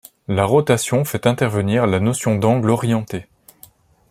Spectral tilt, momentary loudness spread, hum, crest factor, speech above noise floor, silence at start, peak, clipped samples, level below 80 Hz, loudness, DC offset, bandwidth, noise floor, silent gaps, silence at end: -6 dB/octave; 6 LU; none; 18 dB; 32 dB; 0.3 s; -2 dBFS; under 0.1%; -54 dBFS; -18 LUFS; under 0.1%; 16 kHz; -49 dBFS; none; 0.9 s